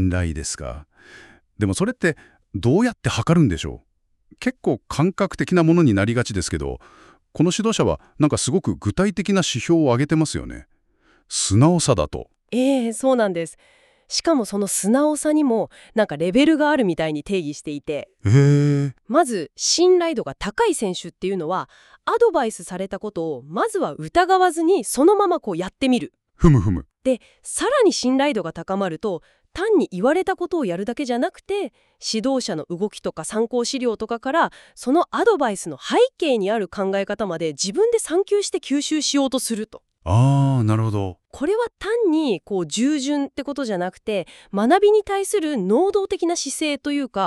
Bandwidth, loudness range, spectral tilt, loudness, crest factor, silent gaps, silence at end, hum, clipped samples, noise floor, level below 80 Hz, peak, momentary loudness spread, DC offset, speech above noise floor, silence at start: 13.5 kHz; 4 LU; -5.5 dB/octave; -21 LUFS; 18 dB; none; 0 s; none; under 0.1%; -60 dBFS; -44 dBFS; -2 dBFS; 12 LU; under 0.1%; 40 dB; 0 s